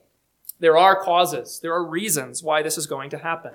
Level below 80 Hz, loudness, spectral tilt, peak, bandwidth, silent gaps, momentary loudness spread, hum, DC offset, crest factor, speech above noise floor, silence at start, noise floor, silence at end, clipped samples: -74 dBFS; -21 LUFS; -2.5 dB/octave; -2 dBFS; 19 kHz; none; 13 LU; none; under 0.1%; 20 dB; 24 dB; 0.6 s; -44 dBFS; 0.05 s; under 0.1%